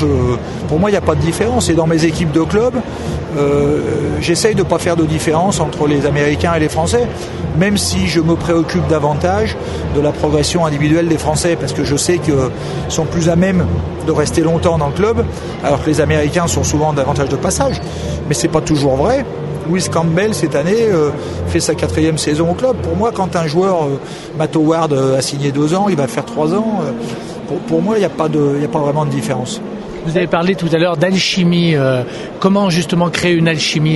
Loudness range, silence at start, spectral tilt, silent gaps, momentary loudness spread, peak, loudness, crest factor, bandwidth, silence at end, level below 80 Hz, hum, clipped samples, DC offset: 2 LU; 0 s; -5.5 dB/octave; none; 6 LU; 0 dBFS; -15 LUFS; 14 dB; 12 kHz; 0 s; -34 dBFS; none; under 0.1%; under 0.1%